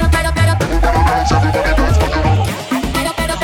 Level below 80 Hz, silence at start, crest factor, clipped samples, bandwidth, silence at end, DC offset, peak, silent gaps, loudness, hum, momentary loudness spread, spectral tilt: -18 dBFS; 0 s; 12 dB; under 0.1%; 18 kHz; 0 s; under 0.1%; -2 dBFS; none; -14 LUFS; none; 5 LU; -5.5 dB/octave